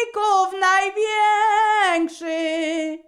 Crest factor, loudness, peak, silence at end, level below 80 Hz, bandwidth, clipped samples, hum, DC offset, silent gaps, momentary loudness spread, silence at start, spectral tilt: 12 dB; -19 LUFS; -8 dBFS; 0.1 s; -64 dBFS; 12 kHz; under 0.1%; none; under 0.1%; none; 7 LU; 0 s; 0 dB/octave